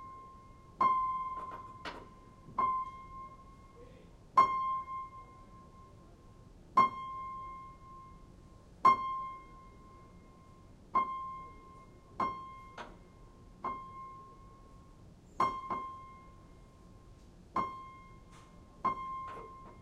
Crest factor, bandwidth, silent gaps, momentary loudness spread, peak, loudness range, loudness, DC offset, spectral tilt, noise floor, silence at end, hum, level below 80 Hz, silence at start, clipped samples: 24 dB; 10.5 kHz; none; 27 LU; -14 dBFS; 10 LU; -35 LUFS; under 0.1%; -5.5 dB/octave; -57 dBFS; 0 s; none; -60 dBFS; 0 s; under 0.1%